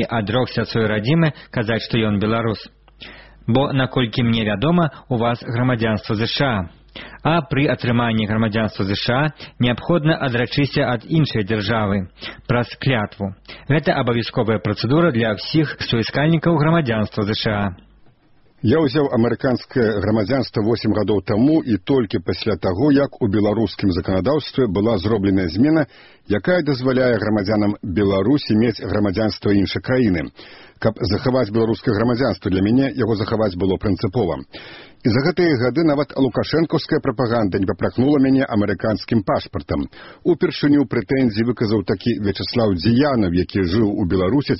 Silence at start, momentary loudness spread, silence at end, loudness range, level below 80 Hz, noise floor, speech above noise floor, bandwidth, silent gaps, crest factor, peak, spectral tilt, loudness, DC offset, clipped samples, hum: 0 s; 6 LU; 0 s; 2 LU; -44 dBFS; -53 dBFS; 34 dB; 6 kHz; none; 18 dB; -2 dBFS; -5.5 dB/octave; -19 LUFS; 0.3%; under 0.1%; none